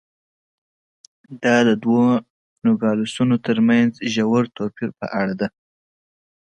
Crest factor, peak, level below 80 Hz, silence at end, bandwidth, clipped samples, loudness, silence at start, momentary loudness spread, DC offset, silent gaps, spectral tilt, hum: 18 dB; -2 dBFS; -62 dBFS; 1 s; 9 kHz; under 0.1%; -19 LUFS; 1.3 s; 10 LU; under 0.1%; 2.30-2.56 s; -6 dB/octave; none